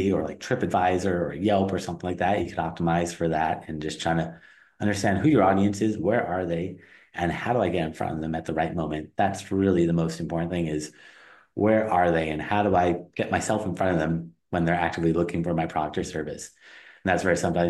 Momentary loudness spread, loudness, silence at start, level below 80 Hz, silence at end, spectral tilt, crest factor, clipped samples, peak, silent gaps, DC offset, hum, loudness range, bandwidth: 9 LU; -26 LUFS; 0 s; -50 dBFS; 0 s; -6.5 dB/octave; 18 dB; under 0.1%; -6 dBFS; none; under 0.1%; none; 3 LU; 12.5 kHz